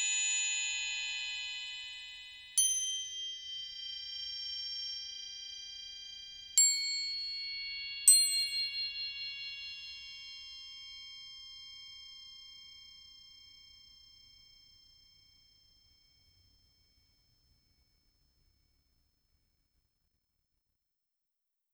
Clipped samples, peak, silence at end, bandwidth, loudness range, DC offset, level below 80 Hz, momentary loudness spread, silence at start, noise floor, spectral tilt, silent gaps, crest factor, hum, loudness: under 0.1%; -10 dBFS; 7.5 s; over 20 kHz; 21 LU; under 0.1%; -74 dBFS; 23 LU; 0 s; -87 dBFS; 5.5 dB/octave; none; 28 dB; none; -32 LUFS